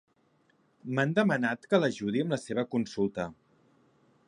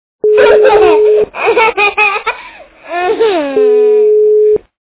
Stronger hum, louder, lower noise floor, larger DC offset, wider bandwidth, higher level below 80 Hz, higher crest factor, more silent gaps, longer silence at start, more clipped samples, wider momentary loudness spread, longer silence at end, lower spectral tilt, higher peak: neither; second, -30 LUFS vs -9 LUFS; first, -69 dBFS vs -33 dBFS; neither; first, 11 kHz vs 4 kHz; second, -68 dBFS vs -46 dBFS; first, 20 dB vs 10 dB; neither; first, 0.85 s vs 0.25 s; second, under 0.1% vs 0.3%; about the same, 9 LU vs 10 LU; first, 0.95 s vs 0.25 s; about the same, -6.5 dB/octave vs -7.5 dB/octave; second, -12 dBFS vs 0 dBFS